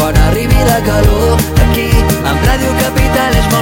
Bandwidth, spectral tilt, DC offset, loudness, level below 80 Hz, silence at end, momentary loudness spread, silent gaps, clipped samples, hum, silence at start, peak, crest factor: 17 kHz; -5.5 dB/octave; under 0.1%; -11 LUFS; -14 dBFS; 0 s; 2 LU; none; under 0.1%; none; 0 s; 0 dBFS; 10 dB